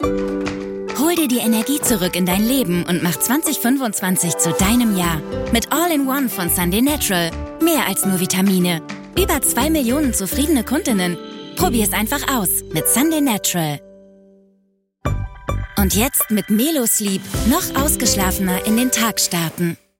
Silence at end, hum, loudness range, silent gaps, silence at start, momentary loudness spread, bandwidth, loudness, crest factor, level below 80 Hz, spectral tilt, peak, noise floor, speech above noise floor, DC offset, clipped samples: 0.25 s; none; 3 LU; none; 0 s; 8 LU; 17 kHz; -17 LUFS; 14 dB; -34 dBFS; -4 dB/octave; -4 dBFS; -62 dBFS; 45 dB; under 0.1%; under 0.1%